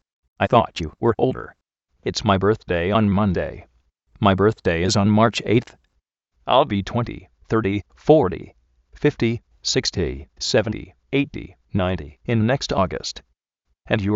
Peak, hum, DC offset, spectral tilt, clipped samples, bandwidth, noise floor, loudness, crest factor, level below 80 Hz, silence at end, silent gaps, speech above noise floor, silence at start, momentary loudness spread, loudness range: -2 dBFS; none; under 0.1%; -5.5 dB/octave; under 0.1%; 8.2 kHz; -73 dBFS; -21 LUFS; 20 dB; -44 dBFS; 0 s; none; 53 dB; 0.4 s; 12 LU; 4 LU